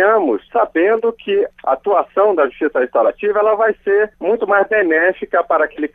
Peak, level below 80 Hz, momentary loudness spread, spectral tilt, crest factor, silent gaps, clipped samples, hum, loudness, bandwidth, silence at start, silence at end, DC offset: -2 dBFS; -54 dBFS; 4 LU; -7.5 dB/octave; 14 dB; none; under 0.1%; none; -16 LUFS; 3.8 kHz; 0 s; 0.1 s; under 0.1%